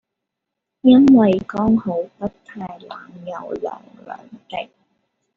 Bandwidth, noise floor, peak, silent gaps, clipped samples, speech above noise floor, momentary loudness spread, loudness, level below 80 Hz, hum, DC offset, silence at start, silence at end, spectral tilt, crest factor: 6.4 kHz; -81 dBFS; -2 dBFS; none; under 0.1%; 63 dB; 25 LU; -16 LUFS; -54 dBFS; none; under 0.1%; 0.85 s; 0.75 s; -6.5 dB/octave; 18 dB